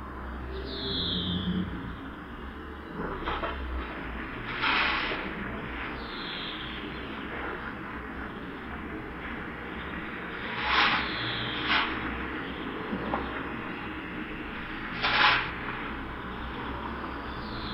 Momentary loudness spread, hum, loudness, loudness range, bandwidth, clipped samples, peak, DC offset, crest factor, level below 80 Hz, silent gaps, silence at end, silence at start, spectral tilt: 13 LU; none; -31 LUFS; 8 LU; 15 kHz; under 0.1%; -8 dBFS; under 0.1%; 24 dB; -44 dBFS; none; 0 s; 0 s; -6 dB/octave